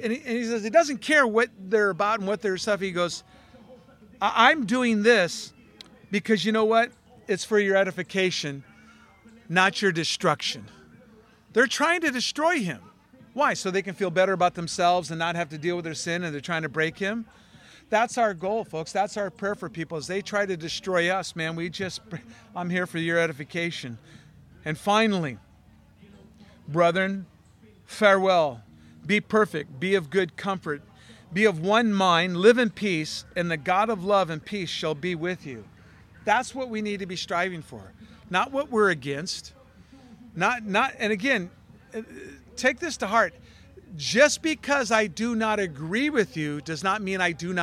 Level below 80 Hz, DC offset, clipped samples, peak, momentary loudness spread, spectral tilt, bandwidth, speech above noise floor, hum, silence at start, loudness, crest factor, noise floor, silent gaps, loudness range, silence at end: -62 dBFS; under 0.1%; under 0.1%; -2 dBFS; 14 LU; -4 dB/octave; 15 kHz; 30 dB; none; 0 s; -25 LUFS; 24 dB; -55 dBFS; none; 5 LU; 0 s